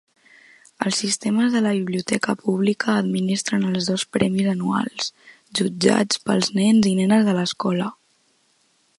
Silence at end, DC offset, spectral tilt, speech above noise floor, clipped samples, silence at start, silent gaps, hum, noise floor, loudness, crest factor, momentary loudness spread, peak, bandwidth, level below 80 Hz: 1.05 s; under 0.1%; -4.5 dB/octave; 43 dB; under 0.1%; 0.8 s; none; none; -63 dBFS; -21 LUFS; 20 dB; 7 LU; -2 dBFS; 11.5 kHz; -64 dBFS